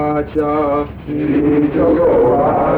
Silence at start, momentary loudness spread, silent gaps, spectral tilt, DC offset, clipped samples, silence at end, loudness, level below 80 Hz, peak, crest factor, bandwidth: 0 s; 8 LU; none; -10 dB/octave; under 0.1%; under 0.1%; 0 s; -14 LUFS; -34 dBFS; -4 dBFS; 10 dB; 4.4 kHz